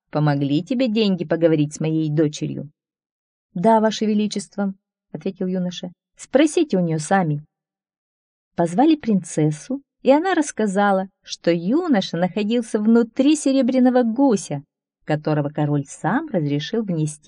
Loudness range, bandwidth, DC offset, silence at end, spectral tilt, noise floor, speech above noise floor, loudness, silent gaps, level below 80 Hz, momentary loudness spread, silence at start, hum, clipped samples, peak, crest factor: 4 LU; 10.5 kHz; under 0.1%; 0.1 s; -6 dB/octave; under -90 dBFS; over 71 dB; -20 LUFS; 3.11-3.49 s, 7.98-8.51 s; -66 dBFS; 12 LU; 0.15 s; none; under 0.1%; -4 dBFS; 18 dB